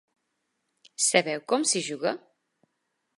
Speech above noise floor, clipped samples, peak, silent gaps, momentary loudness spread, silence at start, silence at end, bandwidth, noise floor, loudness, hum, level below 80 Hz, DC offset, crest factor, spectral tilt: 52 dB; under 0.1%; -4 dBFS; none; 13 LU; 1 s; 1 s; 11.5 kHz; -79 dBFS; -25 LUFS; none; -86 dBFS; under 0.1%; 26 dB; -2 dB/octave